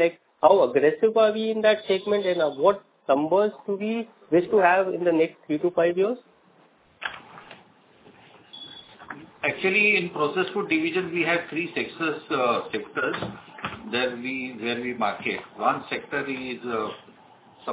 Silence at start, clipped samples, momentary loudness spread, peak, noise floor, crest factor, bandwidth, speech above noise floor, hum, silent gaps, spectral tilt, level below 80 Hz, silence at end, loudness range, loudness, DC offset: 0 s; under 0.1%; 16 LU; -4 dBFS; -58 dBFS; 20 dB; 4 kHz; 35 dB; none; none; -9 dB/octave; -68 dBFS; 0 s; 7 LU; -24 LUFS; under 0.1%